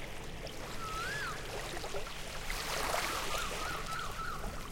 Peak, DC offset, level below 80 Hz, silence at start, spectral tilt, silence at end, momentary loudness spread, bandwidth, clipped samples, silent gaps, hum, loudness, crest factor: -22 dBFS; under 0.1%; -46 dBFS; 0 s; -2.5 dB/octave; 0 s; 9 LU; 17 kHz; under 0.1%; none; none; -38 LUFS; 16 dB